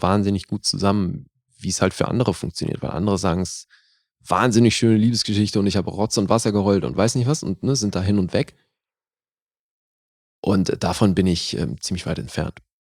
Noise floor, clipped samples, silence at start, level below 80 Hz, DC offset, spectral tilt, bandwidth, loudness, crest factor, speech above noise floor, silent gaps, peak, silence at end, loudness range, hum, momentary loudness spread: under -90 dBFS; under 0.1%; 0 s; -48 dBFS; under 0.1%; -5.5 dB/octave; 15 kHz; -21 LUFS; 20 dB; over 70 dB; 9.42-9.46 s, 9.59-10.43 s; -2 dBFS; 0.4 s; 6 LU; none; 10 LU